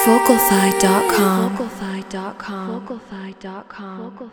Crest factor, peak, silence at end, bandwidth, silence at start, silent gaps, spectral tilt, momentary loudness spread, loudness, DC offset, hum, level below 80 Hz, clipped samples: 18 dB; 0 dBFS; 0.05 s; over 20 kHz; 0 s; none; -4.5 dB/octave; 20 LU; -17 LUFS; under 0.1%; none; -52 dBFS; under 0.1%